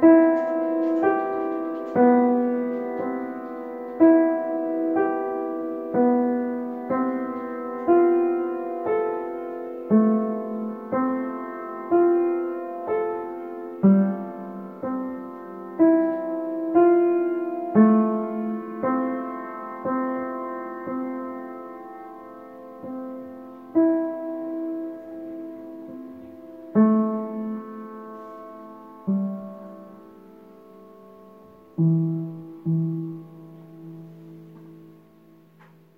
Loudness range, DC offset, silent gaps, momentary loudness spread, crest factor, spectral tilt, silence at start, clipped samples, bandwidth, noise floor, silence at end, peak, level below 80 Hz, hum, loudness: 11 LU; under 0.1%; none; 21 LU; 18 dB; -11.5 dB/octave; 0 s; under 0.1%; 3.1 kHz; -53 dBFS; 1.05 s; -6 dBFS; -72 dBFS; none; -24 LUFS